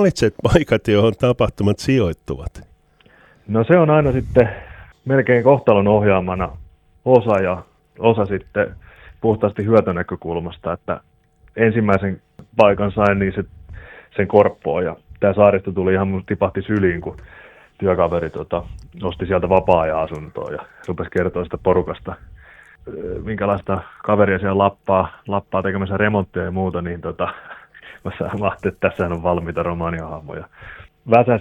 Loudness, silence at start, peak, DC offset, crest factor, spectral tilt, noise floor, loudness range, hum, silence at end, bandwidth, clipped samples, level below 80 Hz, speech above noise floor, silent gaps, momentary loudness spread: -19 LUFS; 0 s; 0 dBFS; under 0.1%; 18 dB; -7.5 dB/octave; -52 dBFS; 6 LU; none; 0 s; 11 kHz; under 0.1%; -40 dBFS; 34 dB; none; 16 LU